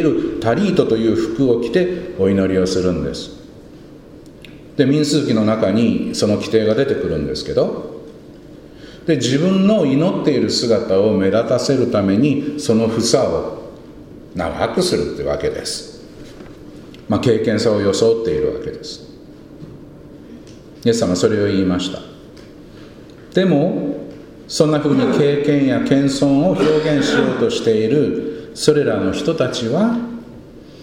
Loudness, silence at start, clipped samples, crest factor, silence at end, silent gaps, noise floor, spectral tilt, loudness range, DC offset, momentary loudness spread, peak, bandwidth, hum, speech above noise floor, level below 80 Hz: -17 LUFS; 0 s; under 0.1%; 18 dB; 0 s; none; -39 dBFS; -6 dB/octave; 5 LU; under 0.1%; 18 LU; 0 dBFS; 15.5 kHz; none; 23 dB; -44 dBFS